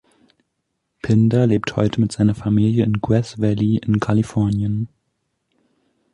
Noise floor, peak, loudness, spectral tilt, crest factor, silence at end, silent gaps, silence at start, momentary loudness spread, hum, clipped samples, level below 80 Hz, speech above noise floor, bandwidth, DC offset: -74 dBFS; -4 dBFS; -19 LUFS; -8 dB/octave; 16 dB; 1.3 s; none; 1.05 s; 6 LU; none; under 0.1%; -46 dBFS; 57 dB; 10.5 kHz; under 0.1%